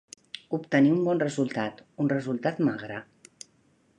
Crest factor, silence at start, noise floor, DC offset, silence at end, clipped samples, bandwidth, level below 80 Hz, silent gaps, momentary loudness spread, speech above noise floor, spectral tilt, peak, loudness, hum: 18 dB; 0.5 s; -65 dBFS; under 0.1%; 0.95 s; under 0.1%; 11 kHz; -72 dBFS; none; 24 LU; 39 dB; -6.5 dB/octave; -10 dBFS; -27 LUFS; none